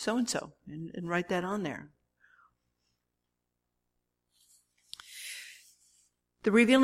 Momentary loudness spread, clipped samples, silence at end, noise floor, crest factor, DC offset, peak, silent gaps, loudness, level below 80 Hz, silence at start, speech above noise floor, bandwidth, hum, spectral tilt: 22 LU; under 0.1%; 0 s; -84 dBFS; 22 dB; under 0.1%; -12 dBFS; none; -32 LUFS; -72 dBFS; 0 s; 55 dB; 15.5 kHz; 60 Hz at -70 dBFS; -4.5 dB/octave